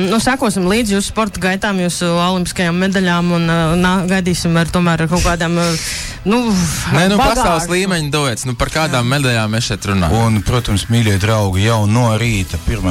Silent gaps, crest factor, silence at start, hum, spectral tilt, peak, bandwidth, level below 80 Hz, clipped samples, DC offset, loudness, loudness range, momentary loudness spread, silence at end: none; 10 dB; 0 s; none; -5 dB/octave; -4 dBFS; 16 kHz; -30 dBFS; under 0.1%; under 0.1%; -15 LUFS; 1 LU; 4 LU; 0 s